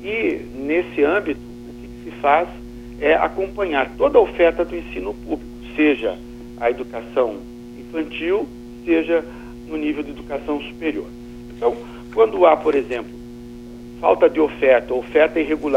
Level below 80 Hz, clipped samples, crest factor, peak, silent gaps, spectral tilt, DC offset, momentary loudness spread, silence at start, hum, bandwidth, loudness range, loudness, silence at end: -44 dBFS; under 0.1%; 18 dB; -2 dBFS; none; -6.5 dB/octave; under 0.1%; 21 LU; 0 s; 60 Hz at -40 dBFS; 10.5 kHz; 5 LU; -20 LUFS; 0 s